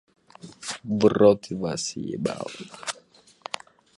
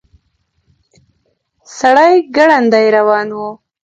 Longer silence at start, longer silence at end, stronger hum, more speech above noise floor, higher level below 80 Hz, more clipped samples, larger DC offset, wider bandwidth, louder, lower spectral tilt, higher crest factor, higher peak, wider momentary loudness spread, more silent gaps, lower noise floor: second, 0.45 s vs 1.7 s; first, 1.05 s vs 0.3 s; neither; second, 32 dB vs 53 dB; about the same, -60 dBFS vs -60 dBFS; neither; neither; first, 11.5 kHz vs 8.6 kHz; second, -25 LUFS vs -10 LUFS; about the same, -5 dB/octave vs -4.5 dB/octave; first, 22 dB vs 14 dB; second, -4 dBFS vs 0 dBFS; about the same, 18 LU vs 16 LU; neither; second, -55 dBFS vs -63 dBFS